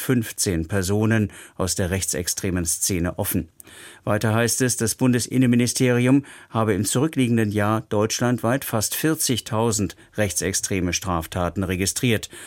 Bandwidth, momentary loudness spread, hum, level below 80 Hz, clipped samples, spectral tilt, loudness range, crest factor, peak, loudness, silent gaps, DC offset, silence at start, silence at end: 17 kHz; 7 LU; none; -46 dBFS; under 0.1%; -4.5 dB/octave; 3 LU; 18 dB; -4 dBFS; -22 LUFS; none; under 0.1%; 0 s; 0 s